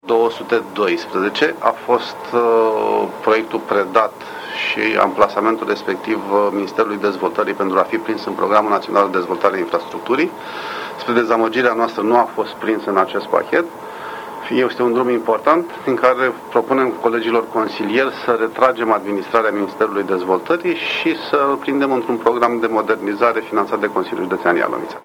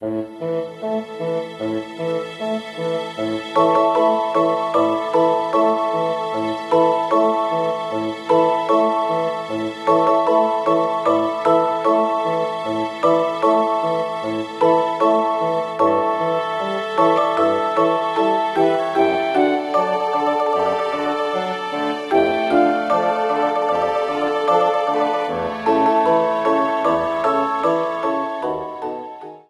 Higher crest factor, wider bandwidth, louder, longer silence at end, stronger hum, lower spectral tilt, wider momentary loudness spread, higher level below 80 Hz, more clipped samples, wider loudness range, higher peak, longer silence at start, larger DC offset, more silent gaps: about the same, 18 dB vs 16 dB; first, 17 kHz vs 12 kHz; about the same, -17 LUFS vs -19 LUFS; about the same, 0.05 s vs 0.1 s; neither; about the same, -5.5 dB/octave vs -6 dB/octave; about the same, 6 LU vs 8 LU; about the same, -62 dBFS vs -60 dBFS; neither; about the same, 1 LU vs 2 LU; first, 0 dBFS vs -4 dBFS; about the same, 0.05 s vs 0 s; neither; neither